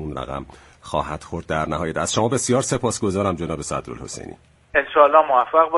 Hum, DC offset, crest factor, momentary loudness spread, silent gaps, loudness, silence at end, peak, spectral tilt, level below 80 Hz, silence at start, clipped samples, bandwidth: none; under 0.1%; 20 dB; 18 LU; none; -20 LUFS; 0 s; 0 dBFS; -4.5 dB/octave; -44 dBFS; 0 s; under 0.1%; 11.5 kHz